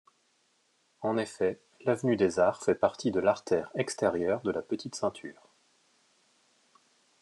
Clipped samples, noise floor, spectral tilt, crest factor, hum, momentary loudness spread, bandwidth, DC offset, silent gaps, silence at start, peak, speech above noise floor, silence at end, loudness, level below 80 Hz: under 0.1%; -71 dBFS; -5.5 dB/octave; 22 dB; none; 8 LU; 12 kHz; under 0.1%; none; 1 s; -10 dBFS; 42 dB; 1.9 s; -30 LUFS; -72 dBFS